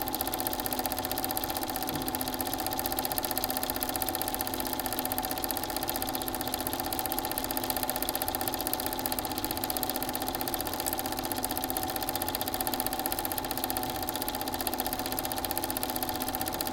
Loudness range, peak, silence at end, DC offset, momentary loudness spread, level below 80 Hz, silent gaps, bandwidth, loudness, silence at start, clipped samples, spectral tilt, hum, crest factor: 1 LU; -6 dBFS; 0 s; under 0.1%; 2 LU; -50 dBFS; none; 17.5 kHz; -31 LUFS; 0 s; under 0.1%; -2.5 dB/octave; none; 26 dB